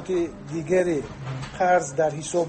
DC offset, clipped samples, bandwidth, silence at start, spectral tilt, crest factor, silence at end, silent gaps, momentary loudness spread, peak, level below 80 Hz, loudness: under 0.1%; under 0.1%; 8.8 kHz; 0 s; -5.5 dB/octave; 16 dB; 0 s; none; 12 LU; -8 dBFS; -50 dBFS; -25 LUFS